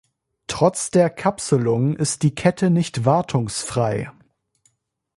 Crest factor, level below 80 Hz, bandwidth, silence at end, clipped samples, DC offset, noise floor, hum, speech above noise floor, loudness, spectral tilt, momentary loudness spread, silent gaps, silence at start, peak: 18 dB; -52 dBFS; 11.5 kHz; 1.05 s; under 0.1%; under 0.1%; -65 dBFS; none; 46 dB; -20 LUFS; -5.5 dB/octave; 7 LU; none; 0.5 s; -2 dBFS